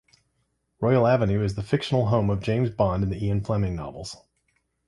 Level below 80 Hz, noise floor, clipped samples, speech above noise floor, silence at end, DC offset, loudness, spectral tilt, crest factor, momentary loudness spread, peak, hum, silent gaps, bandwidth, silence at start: -44 dBFS; -73 dBFS; under 0.1%; 50 dB; 0.75 s; under 0.1%; -24 LUFS; -7.5 dB/octave; 18 dB; 14 LU; -6 dBFS; none; none; 11.5 kHz; 0.8 s